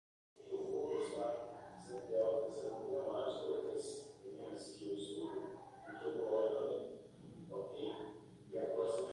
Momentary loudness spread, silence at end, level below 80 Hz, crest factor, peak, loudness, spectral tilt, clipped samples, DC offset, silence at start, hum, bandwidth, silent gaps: 15 LU; 0 s; -78 dBFS; 16 dB; -26 dBFS; -42 LUFS; -5 dB/octave; under 0.1%; under 0.1%; 0.35 s; none; 11.5 kHz; none